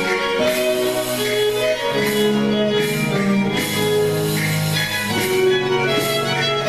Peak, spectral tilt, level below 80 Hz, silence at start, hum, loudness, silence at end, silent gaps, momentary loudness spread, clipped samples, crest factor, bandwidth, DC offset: -6 dBFS; -4.5 dB/octave; -48 dBFS; 0 s; none; -18 LUFS; 0 s; none; 2 LU; under 0.1%; 12 dB; 14.5 kHz; under 0.1%